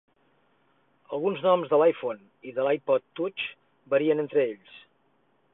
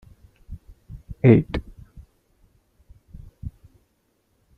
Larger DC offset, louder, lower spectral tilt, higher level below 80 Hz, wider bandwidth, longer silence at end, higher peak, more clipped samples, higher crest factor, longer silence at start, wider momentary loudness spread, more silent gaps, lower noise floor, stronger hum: neither; second, -26 LUFS vs -19 LUFS; about the same, -9.5 dB/octave vs -10.5 dB/octave; second, -76 dBFS vs -44 dBFS; second, 4 kHz vs 5 kHz; second, 0.75 s vs 1.1 s; second, -10 dBFS vs -2 dBFS; neither; second, 18 dB vs 24 dB; first, 1.1 s vs 0.5 s; second, 13 LU vs 28 LU; neither; about the same, -68 dBFS vs -68 dBFS; neither